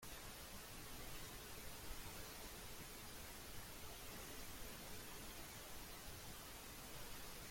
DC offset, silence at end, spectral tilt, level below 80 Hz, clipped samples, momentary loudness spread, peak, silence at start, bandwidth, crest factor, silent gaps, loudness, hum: under 0.1%; 0 s; -2.5 dB/octave; -60 dBFS; under 0.1%; 1 LU; -38 dBFS; 0 s; 16.5 kHz; 14 dB; none; -53 LUFS; none